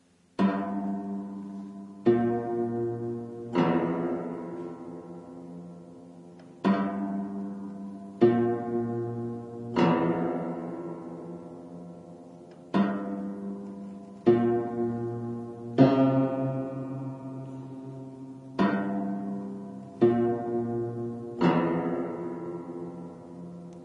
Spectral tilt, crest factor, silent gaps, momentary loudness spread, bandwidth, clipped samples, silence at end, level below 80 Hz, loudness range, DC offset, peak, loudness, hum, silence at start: -9 dB/octave; 22 dB; none; 19 LU; 7.6 kHz; under 0.1%; 0 s; -68 dBFS; 7 LU; under 0.1%; -8 dBFS; -29 LUFS; none; 0.4 s